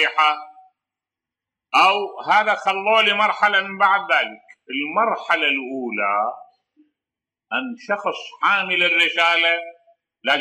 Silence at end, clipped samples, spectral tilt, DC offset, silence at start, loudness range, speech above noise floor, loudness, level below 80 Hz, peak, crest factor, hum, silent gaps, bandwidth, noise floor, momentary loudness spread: 0 s; under 0.1%; -2.5 dB/octave; under 0.1%; 0 s; 6 LU; 69 dB; -19 LUFS; -88 dBFS; -4 dBFS; 16 dB; none; none; 15 kHz; -88 dBFS; 11 LU